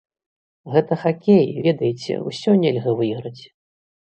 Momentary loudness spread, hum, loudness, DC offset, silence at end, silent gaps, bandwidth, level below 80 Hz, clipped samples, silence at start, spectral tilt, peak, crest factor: 10 LU; none; -19 LUFS; under 0.1%; 0.6 s; none; 8.6 kHz; -64 dBFS; under 0.1%; 0.65 s; -7.5 dB/octave; -2 dBFS; 18 dB